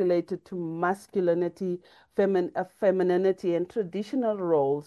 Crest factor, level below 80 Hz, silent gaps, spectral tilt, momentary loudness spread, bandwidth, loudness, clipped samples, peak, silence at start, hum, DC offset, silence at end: 16 dB; -72 dBFS; none; -8 dB/octave; 9 LU; 12 kHz; -27 LUFS; under 0.1%; -12 dBFS; 0 s; none; under 0.1%; 0.05 s